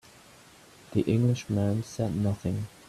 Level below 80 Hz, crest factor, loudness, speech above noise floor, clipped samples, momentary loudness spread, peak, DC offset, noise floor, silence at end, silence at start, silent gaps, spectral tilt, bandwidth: -58 dBFS; 18 dB; -29 LUFS; 27 dB; under 0.1%; 7 LU; -12 dBFS; under 0.1%; -54 dBFS; 0.2 s; 0.9 s; none; -7.5 dB/octave; 13.5 kHz